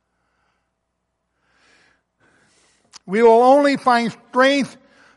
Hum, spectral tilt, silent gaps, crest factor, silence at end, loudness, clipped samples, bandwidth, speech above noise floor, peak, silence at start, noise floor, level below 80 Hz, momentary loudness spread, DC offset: none; -4.5 dB/octave; none; 16 dB; 0.45 s; -15 LUFS; under 0.1%; 11.5 kHz; 59 dB; -4 dBFS; 3.1 s; -74 dBFS; -68 dBFS; 11 LU; under 0.1%